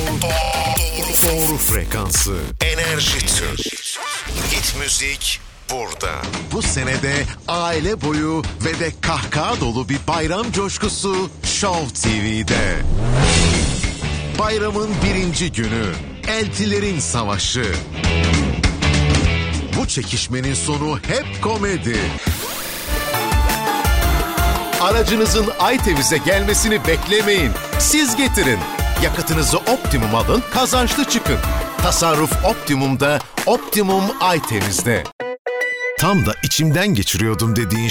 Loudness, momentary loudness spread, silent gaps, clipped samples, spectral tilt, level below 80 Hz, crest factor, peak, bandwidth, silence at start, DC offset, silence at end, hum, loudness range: -18 LUFS; 7 LU; 35.12-35.19 s, 35.39-35.45 s; under 0.1%; -3.5 dB/octave; -26 dBFS; 16 dB; -2 dBFS; over 20 kHz; 0 s; under 0.1%; 0 s; none; 4 LU